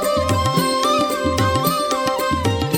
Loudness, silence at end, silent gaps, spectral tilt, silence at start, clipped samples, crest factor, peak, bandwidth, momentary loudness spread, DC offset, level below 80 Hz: -18 LUFS; 0 s; none; -4.5 dB/octave; 0 s; under 0.1%; 16 dB; -2 dBFS; 17.5 kHz; 2 LU; under 0.1%; -38 dBFS